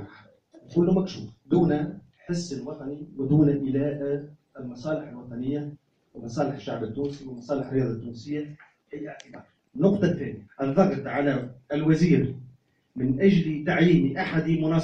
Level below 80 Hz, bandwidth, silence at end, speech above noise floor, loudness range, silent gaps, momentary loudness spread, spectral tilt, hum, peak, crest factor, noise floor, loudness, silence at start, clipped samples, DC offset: -54 dBFS; 8 kHz; 0 s; 31 dB; 8 LU; none; 19 LU; -8 dB/octave; none; -6 dBFS; 20 dB; -56 dBFS; -26 LUFS; 0 s; under 0.1%; under 0.1%